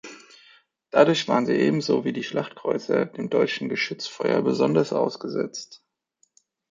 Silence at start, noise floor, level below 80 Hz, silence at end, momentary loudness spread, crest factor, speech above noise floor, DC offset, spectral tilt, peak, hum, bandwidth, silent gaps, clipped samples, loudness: 0.05 s; -68 dBFS; -70 dBFS; 0.95 s; 10 LU; 22 dB; 45 dB; under 0.1%; -5.5 dB/octave; -2 dBFS; none; 7.6 kHz; none; under 0.1%; -24 LUFS